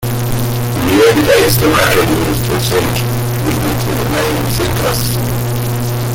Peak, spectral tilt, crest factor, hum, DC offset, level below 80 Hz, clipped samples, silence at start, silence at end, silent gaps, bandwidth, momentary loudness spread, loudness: 0 dBFS; -5 dB/octave; 12 dB; none; under 0.1%; -28 dBFS; under 0.1%; 0 s; 0 s; none; 17 kHz; 7 LU; -13 LUFS